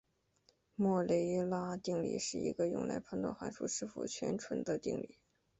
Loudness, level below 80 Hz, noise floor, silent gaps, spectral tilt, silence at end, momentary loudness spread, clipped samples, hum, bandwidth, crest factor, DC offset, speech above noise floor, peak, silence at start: -38 LUFS; -70 dBFS; -74 dBFS; none; -5.5 dB/octave; 0.55 s; 8 LU; under 0.1%; none; 8.2 kHz; 16 dB; under 0.1%; 37 dB; -22 dBFS; 0.8 s